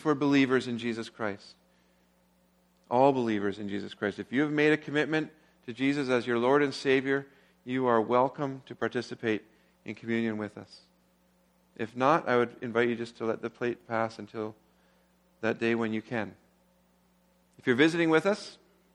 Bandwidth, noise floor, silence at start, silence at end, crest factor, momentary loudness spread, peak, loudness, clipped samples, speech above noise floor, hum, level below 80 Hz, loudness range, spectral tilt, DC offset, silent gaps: 11 kHz; -67 dBFS; 0 s; 0.4 s; 20 dB; 14 LU; -10 dBFS; -29 LUFS; under 0.1%; 38 dB; none; -74 dBFS; 6 LU; -6 dB/octave; under 0.1%; none